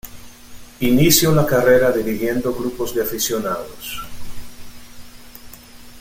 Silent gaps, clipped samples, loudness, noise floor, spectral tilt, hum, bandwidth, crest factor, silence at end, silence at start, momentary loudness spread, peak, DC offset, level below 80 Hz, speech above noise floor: none; under 0.1%; -18 LUFS; -39 dBFS; -4.5 dB/octave; none; 17 kHz; 20 dB; 0 s; 0.05 s; 26 LU; 0 dBFS; under 0.1%; -42 dBFS; 22 dB